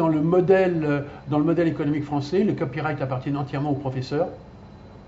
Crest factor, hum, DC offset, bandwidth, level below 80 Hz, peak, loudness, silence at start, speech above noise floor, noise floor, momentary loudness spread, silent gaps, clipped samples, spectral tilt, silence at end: 18 dB; none; under 0.1%; 7.8 kHz; -52 dBFS; -6 dBFS; -23 LUFS; 0 s; 21 dB; -44 dBFS; 8 LU; none; under 0.1%; -8.5 dB/octave; 0.05 s